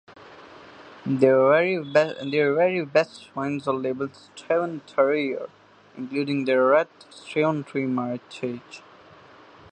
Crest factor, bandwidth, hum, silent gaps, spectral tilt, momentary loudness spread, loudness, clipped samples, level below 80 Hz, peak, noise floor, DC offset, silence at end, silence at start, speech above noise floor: 20 dB; 9.4 kHz; none; none; -6.5 dB/octave; 15 LU; -24 LUFS; under 0.1%; -70 dBFS; -4 dBFS; -50 dBFS; under 0.1%; 0.9 s; 0.1 s; 26 dB